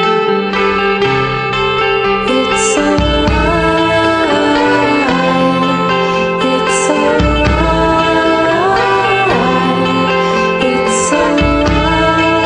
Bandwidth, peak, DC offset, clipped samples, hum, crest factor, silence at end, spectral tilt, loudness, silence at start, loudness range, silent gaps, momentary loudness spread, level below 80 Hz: 10.5 kHz; -2 dBFS; under 0.1%; under 0.1%; none; 10 dB; 0 s; -4.5 dB/octave; -11 LUFS; 0 s; 1 LU; none; 2 LU; -26 dBFS